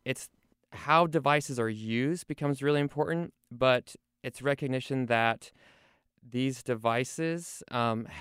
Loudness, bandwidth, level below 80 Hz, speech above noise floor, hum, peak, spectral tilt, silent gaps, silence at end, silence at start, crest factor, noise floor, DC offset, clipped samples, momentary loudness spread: -30 LUFS; 16 kHz; -66 dBFS; 36 dB; none; -10 dBFS; -5.5 dB/octave; none; 0 s; 0.05 s; 20 dB; -66 dBFS; under 0.1%; under 0.1%; 12 LU